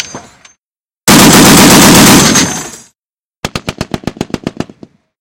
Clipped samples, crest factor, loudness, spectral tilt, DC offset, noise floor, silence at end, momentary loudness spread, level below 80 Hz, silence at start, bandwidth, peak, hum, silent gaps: 4%; 8 dB; -3 LUFS; -3 dB/octave; under 0.1%; under -90 dBFS; 0.55 s; 21 LU; -30 dBFS; 0 s; over 20 kHz; 0 dBFS; none; 0.59-0.85 s, 2.99-3.03 s, 3.09-3.13 s, 3.25-3.31 s, 3.37-3.43 s